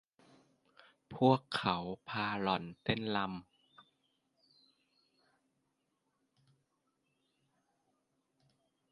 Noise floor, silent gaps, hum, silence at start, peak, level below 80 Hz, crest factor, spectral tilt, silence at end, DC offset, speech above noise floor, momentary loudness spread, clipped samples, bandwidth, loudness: -82 dBFS; none; none; 1.1 s; -14 dBFS; -72 dBFS; 26 dB; -7 dB/octave; 5.5 s; under 0.1%; 48 dB; 11 LU; under 0.1%; 11 kHz; -35 LUFS